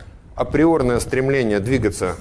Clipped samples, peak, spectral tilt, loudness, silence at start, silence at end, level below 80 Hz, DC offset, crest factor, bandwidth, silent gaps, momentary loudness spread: under 0.1%; -4 dBFS; -6.5 dB/octave; -19 LUFS; 0 s; 0 s; -36 dBFS; under 0.1%; 14 dB; 11 kHz; none; 7 LU